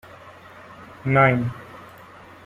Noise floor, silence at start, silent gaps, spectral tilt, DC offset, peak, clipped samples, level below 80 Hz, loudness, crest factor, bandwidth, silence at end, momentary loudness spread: -45 dBFS; 0.25 s; none; -8.5 dB/octave; under 0.1%; -6 dBFS; under 0.1%; -56 dBFS; -20 LUFS; 20 dB; 7.2 kHz; 0.6 s; 27 LU